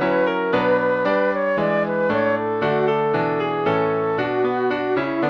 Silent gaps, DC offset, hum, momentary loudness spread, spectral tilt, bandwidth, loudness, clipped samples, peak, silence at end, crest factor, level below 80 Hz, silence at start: none; under 0.1%; none; 3 LU; -8 dB/octave; 6.6 kHz; -20 LUFS; under 0.1%; -6 dBFS; 0 s; 14 dB; -56 dBFS; 0 s